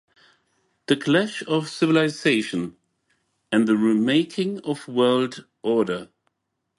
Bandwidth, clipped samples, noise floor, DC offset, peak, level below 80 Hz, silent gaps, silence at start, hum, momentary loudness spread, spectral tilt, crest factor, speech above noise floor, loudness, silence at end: 11.5 kHz; under 0.1%; -78 dBFS; under 0.1%; -6 dBFS; -68 dBFS; none; 0.9 s; none; 10 LU; -5.5 dB/octave; 18 dB; 56 dB; -22 LUFS; 0.75 s